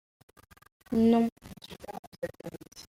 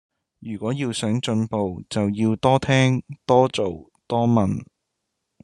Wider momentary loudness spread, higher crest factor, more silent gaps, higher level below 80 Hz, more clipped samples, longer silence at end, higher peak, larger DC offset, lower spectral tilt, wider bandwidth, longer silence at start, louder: first, 21 LU vs 11 LU; about the same, 18 dB vs 20 dB; first, 1.32-1.36 s, 1.99-2.12 s vs none; about the same, -60 dBFS vs -56 dBFS; neither; second, 0.1 s vs 0.8 s; second, -14 dBFS vs -2 dBFS; neither; about the same, -6.5 dB/octave vs -6.5 dB/octave; first, 15.5 kHz vs 11 kHz; first, 0.9 s vs 0.4 s; second, -28 LUFS vs -22 LUFS